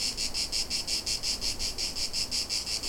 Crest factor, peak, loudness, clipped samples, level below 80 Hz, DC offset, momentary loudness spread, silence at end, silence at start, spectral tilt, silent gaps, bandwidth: 16 dB; -16 dBFS; -29 LUFS; under 0.1%; -44 dBFS; under 0.1%; 2 LU; 0 s; 0 s; 0 dB/octave; none; 17 kHz